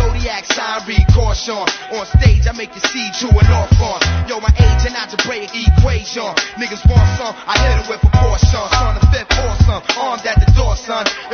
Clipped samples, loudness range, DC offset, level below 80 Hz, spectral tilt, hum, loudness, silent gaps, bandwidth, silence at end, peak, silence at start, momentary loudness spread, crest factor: under 0.1%; 1 LU; under 0.1%; -16 dBFS; -5 dB/octave; none; -15 LUFS; none; 6.8 kHz; 0 s; 0 dBFS; 0 s; 7 LU; 12 dB